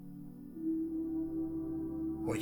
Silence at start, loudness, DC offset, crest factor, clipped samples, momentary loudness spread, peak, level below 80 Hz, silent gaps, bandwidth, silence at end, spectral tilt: 0 s; -38 LUFS; under 0.1%; 14 dB; under 0.1%; 12 LU; -24 dBFS; -58 dBFS; none; 19 kHz; 0 s; -7.5 dB/octave